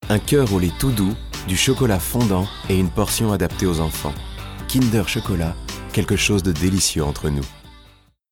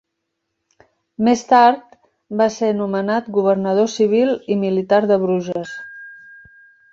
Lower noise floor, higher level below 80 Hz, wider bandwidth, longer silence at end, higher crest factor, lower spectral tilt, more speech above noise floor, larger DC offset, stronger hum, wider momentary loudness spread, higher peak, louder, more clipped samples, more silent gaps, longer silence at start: second, -51 dBFS vs -76 dBFS; first, -34 dBFS vs -64 dBFS; first, 18.5 kHz vs 7.8 kHz; second, 0.5 s vs 0.75 s; about the same, 16 dB vs 18 dB; about the same, -5 dB/octave vs -6 dB/octave; second, 32 dB vs 59 dB; neither; neither; second, 10 LU vs 15 LU; second, -6 dBFS vs -2 dBFS; second, -20 LUFS vs -17 LUFS; neither; neither; second, 0 s vs 1.2 s